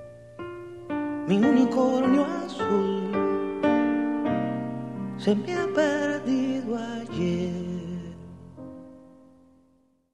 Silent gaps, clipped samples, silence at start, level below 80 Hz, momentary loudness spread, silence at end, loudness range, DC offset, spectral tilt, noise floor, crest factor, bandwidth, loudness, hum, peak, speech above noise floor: none; under 0.1%; 0 s; -60 dBFS; 19 LU; 1.05 s; 8 LU; 0.1%; -7 dB/octave; -64 dBFS; 16 dB; 10 kHz; -26 LUFS; none; -10 dBFS; 40 dB